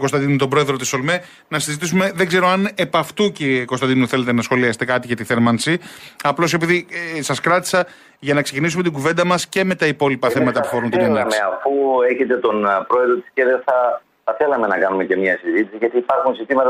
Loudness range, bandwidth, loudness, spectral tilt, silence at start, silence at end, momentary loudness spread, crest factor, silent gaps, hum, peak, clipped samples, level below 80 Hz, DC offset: 1 LU; 15.5 kHz; -18 LUFS; -5 dB/octave; 0 s; 0 s; 5 LU; 14 dB; none; none; -4 dBFS; under 0.1%; -60 dBFS; under 0.1%